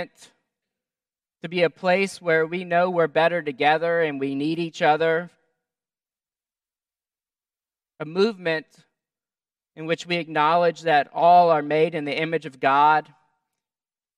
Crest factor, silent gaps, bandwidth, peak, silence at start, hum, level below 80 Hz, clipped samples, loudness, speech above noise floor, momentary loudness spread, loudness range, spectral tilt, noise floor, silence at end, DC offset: 20 dB; none; 11.5 kHz; -4 dBFS; 0 s; none; -80 dBFS; under 0.1%; -21 LUFS; over 69 dB; 11 LU; 10 LU; -5.5 dB/octave; under -90 dBFS; 1.15 s; under 0.1%